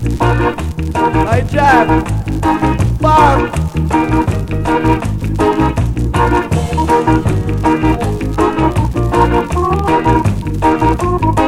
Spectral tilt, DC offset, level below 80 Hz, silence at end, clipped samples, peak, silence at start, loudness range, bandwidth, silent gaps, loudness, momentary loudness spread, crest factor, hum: -7 dB/octave; under 0.1%; -22 dBFS; 0 s; under 0.1%; 0 dBFS; 0 s; 2 LU; 15.5 kHz; none; -13 LUFS; 6 LU; 12 dB; none